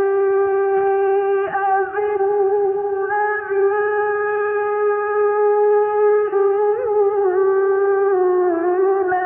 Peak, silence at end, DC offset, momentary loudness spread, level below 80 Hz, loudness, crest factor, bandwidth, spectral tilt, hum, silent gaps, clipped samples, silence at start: -8 dBFS; 0 s; under 0.1%; 4 LU; -62 dBFS; -18 LUFS; 8 dB; 3.1 kHz; -9.5 dB/octave; none; none; under 0.1%; 0 s